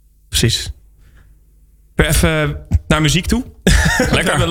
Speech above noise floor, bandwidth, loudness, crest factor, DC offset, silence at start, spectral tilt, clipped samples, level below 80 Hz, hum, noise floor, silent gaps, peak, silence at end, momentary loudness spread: 34 dB; 17 kHz; -15 LUFS; 14 dB; under 0.1%; 0.3 s; -4 dB/octave; under 0.1%; -24 dBFS; none; -48 dBFS; none; -2 dBFS; 0 s; 7 LU